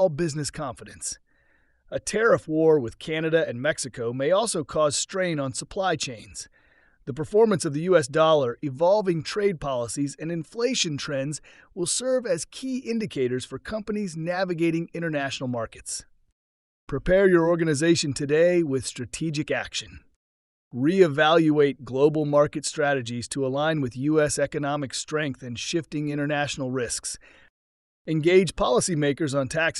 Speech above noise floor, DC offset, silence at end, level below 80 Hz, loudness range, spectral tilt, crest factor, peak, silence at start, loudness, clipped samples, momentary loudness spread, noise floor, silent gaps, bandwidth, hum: 39 dB; under 0.1%; 0 s; -52 dBFS; 5 LU; -4.5 dB/octave; 20 dB; -6 dBFS; 0 s; -24 LUFS; under 0.1%; 13 LU; -64 dBFS; 16.32-16.87 s, 20.16-20.71 s, 27.50-28.05 s; 12 kHz; none